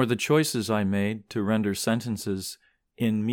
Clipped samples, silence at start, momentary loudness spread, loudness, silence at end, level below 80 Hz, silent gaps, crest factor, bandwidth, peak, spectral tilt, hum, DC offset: under 0.1%; 0 s; 9 LU; -26 LUFS; 0 s; -66 dBFS; none; 16 dB; 19 kHz; -10 dBFS; -5 dB/octave; none; under 0.1%